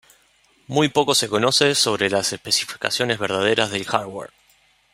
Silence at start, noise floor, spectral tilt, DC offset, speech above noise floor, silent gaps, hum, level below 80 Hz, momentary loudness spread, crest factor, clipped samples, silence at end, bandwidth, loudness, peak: 0.7 s; -59 dBFS; -2.5 dB/octave; under 0.1%; 38 dB; none; none; -62 dBFS; 8 LU; 20 dB; under 0.1%; 0.65 s; 16 kHz; -19 LUFS; -2 dBFS